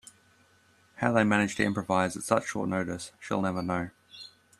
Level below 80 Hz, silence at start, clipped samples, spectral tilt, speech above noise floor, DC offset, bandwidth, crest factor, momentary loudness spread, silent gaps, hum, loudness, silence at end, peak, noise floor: -62 dBFS; 1 s; under 0.1%; -5.5 dB/octave; 35 dB; under 0.1%; 13 kHz; 22 dB; 15 LU; none; none; -29 LUFS; 0.3 s; -8 dBFS; -63 dBFS